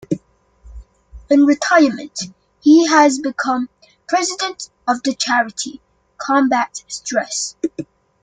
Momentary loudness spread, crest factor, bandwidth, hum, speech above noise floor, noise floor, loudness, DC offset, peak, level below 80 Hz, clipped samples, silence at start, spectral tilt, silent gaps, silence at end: 15 LU; 16 dB; 9.4 kHz; none; 34 dB; -50 dBFS; -17 LUFS; under 0.1%; 0 dBFS; -50 dBFS; under 0.1%; 0.1 s; -3 dB/octave; none; 0.4 s